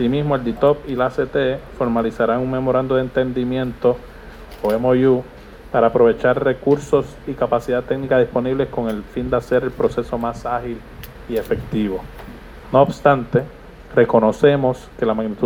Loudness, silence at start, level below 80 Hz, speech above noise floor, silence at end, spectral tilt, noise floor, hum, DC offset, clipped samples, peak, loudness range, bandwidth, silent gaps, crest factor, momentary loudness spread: -19 LUFS; 0 s; -40 dBFS; 19 dB; 0 s; -7.5 dB/octave; -37 dBFS; none; under 0.1%; under 0.1%; 0 dBFS; 5 LU; 19.5 kHz; none; 18 dB; 13 LU